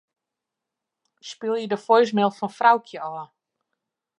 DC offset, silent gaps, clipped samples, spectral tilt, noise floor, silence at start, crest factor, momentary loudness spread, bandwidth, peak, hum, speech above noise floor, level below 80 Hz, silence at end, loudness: under 0.1%; none; under 0.1%; -5.5 dB/octave; -85 dBFS; 1.25 s; 22 dB; 18 LU; 10.5 kHz; -4 dBFS; none; 64 dB; -80 dBFS; 0.95 s; -21 LUFS